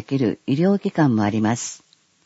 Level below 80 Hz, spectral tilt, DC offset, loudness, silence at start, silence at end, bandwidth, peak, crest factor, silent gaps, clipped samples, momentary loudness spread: -62 dBFS; -6.5 dB/octave; under 0.1%; -20 LUFS; 0.1 s; 0.5 s; 8 kHz; -6 dBFS; 16 dB; none; under 0.1%; 9 LU